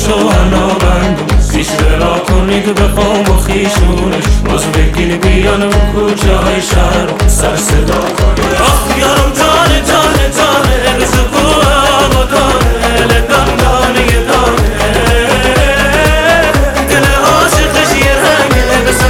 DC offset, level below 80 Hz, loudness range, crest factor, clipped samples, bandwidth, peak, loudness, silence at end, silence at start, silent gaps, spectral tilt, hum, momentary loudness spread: under 0.1%; -14 dBFS; 2 LU; 8 dB; under 0.1%; 17 kHz; 0 dBFS; -9 LUFS; 0 s; 0 s; none; -4.5 dB/octave; none; 4 LU